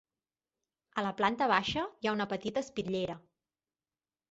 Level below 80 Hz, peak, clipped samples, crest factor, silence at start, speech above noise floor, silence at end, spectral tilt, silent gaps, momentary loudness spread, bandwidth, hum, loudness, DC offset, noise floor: -64 dBFS; -12 dBFS; under 0.1%; 22 dB; 0.95 s; over 57 dB; 1.1 s; -2.5 dB/octave; none; 9 LU; 8 kHz; none; -33 LUFS; under 0.1%; under -90 dBFS